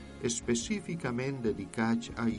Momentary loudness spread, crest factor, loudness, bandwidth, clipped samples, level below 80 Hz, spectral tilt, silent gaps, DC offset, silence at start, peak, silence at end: 3 LU; 18 dB; -33 LUFS; 11.5 kHz; under 0.1%; -54 dBFS; -4.5 dB/octave; none; under 0.1%; 0 s; -16 dBFS; 0 s